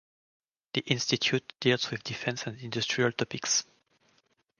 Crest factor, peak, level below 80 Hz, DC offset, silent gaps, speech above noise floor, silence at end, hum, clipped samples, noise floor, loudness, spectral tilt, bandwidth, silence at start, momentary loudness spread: 26 dB; -6 dBFS; -70 dBFS; under 0.1%; none; 40 dB; 0.95 s; none; under 0.1%; -71 dBFS; -29 LUFS; -3 dB/octave; 11 kHz; 0.75 s; 8 LU